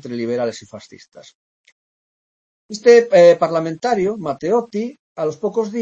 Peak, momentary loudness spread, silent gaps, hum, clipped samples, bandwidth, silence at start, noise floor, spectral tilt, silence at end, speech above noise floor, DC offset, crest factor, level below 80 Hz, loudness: 0 dBFS; 15 LU; 1.35-1.64 s, 1.72-2.69 s, 4.99-5.16 s; none; under 0.1%; 7.8 kHz; 0.05 s; under -90 dBFS; -5.5 dB/octave; 0 s; over 73 dB; under 0.1%; 18 dB; -64 dBFS; -16 LUFS